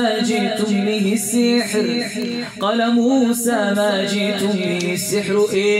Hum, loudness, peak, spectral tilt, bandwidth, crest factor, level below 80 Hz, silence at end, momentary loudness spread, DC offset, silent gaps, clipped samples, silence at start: none; -18 LUFS; -6 dBFS; -4 dB/octave; 16 kHz; 12 dB; -62 dBFS; 0 s; 4 LU; under 0.1%; none; under 0.1%; 0 s